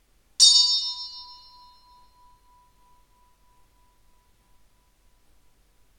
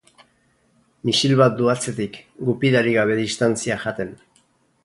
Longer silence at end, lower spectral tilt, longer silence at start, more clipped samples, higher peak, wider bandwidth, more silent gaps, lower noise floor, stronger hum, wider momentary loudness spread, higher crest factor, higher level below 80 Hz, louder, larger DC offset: first, 4.75 s vs 0.7 s; second, 4.5 dB/octave vs -5 dB/octave; second, 0.4 s vs 1.05 s; neither; about the same, -2 dBFS vs -2 dBFS; first, 17 kHz vs 11.5 kHz; neither; about the same, -61 dBFS vs -62 dBFS; neither; first, 27 LU vs 12 LU; first, 26 dB vs 20 dB; second, -64 dBFS vs -58 dBFS; first, -17 LUFS vs -20 LUFS; neither